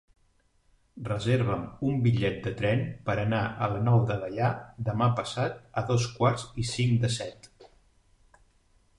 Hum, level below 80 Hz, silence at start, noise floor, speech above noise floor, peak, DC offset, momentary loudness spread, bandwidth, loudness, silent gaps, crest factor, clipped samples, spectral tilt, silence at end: none; -52 dBFS; 0.95 s; -67 dBFS; 40 dB; -10 dBFS; under 0.1%; 8 LU; 11 kHz; -28 LUFS; none; 18 dB; under 0.1%; -6.5 dB/octave; 1.3 s